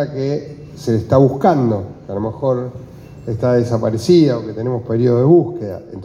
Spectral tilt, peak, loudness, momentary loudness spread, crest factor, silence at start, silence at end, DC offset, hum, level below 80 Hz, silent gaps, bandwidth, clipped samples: -8.5 dB/octave; 0 dBFS; -16 LUFS; 15 LU; 16 dB; 0 s; 0 s; under 0.1%; none; -48 dBFS; none; 10.5 kHz; under 0.1%